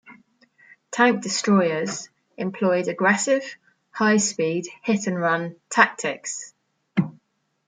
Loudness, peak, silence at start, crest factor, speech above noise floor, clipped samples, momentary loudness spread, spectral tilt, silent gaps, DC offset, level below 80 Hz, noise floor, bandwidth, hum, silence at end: -22 LUFS; -2 dBFS; 0.1 s; 22 dB; 45 dB; under 0.1%; 13 LU; -4 dB/octave; none; under 0.1%; -72 dBFS; -67 dBFS; 9.6 kHz; none; 0.55 s